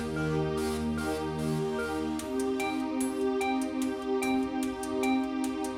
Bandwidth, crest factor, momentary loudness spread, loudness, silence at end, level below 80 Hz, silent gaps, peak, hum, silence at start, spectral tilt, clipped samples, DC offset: 16.5 kHz; 12 dB; 3 LU; -31 LUFS; 0 s; -50 dBFS; none; -18 dBFS; none; 0 s; -5.5 dB/octave; under 0.1%; under 0.1%